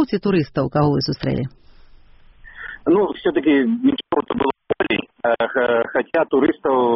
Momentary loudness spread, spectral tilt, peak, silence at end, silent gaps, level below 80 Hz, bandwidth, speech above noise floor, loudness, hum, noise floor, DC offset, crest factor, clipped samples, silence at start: 6 LU; -5 dB/octave; -6 dBFS; 0 s; none; -48 dBFS; 6 kHz; 28 dB; -19 LUFS; none; -46 dBFS; under 0.1%; 14 dB; under 0.1%; 0 s